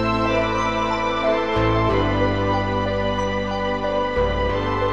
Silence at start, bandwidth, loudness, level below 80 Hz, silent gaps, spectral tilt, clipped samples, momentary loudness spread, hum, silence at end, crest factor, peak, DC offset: 0 s; 9 kHz; -21 LUFS; -32 dBFS; none; -6.5 dB/octave; under 0.1%; 3 LU; none; 0 s; 14 dB; -6 dBFS; 1%